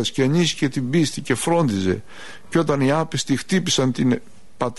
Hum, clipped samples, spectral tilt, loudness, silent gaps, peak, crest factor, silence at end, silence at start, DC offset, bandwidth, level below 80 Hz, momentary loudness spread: none; under 0.1%; -5 dB/octave; -21 LUFS; none; -6 dBFS; 14 dB; 0.05 s; 0 s; 1%; 11.5 kHz; -54 dBFS; 7 LU